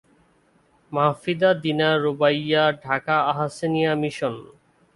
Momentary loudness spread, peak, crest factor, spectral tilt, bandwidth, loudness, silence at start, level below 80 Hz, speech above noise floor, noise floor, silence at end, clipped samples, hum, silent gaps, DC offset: 7 LU; -4 dBFS; 18 dB; -6 dB/octave; 11.5 kHz; -22 LUFS; 0.9 s; -64 dBFS; 39 dB; -61 dBFS; 0.5 s; under 0.1%; none; none; under 0.1%